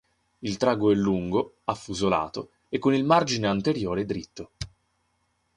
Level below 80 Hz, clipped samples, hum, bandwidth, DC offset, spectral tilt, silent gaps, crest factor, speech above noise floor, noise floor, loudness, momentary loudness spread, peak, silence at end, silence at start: -54 dBFS; under 0.1%; none; 11 kHz; under 0.1%; -5.5 dB/octave; none; 20 dB; 47 dB; -72 dBFS; -25 LUFS; 17 LU; -6 dBFS; 0.9 s; 0.4 s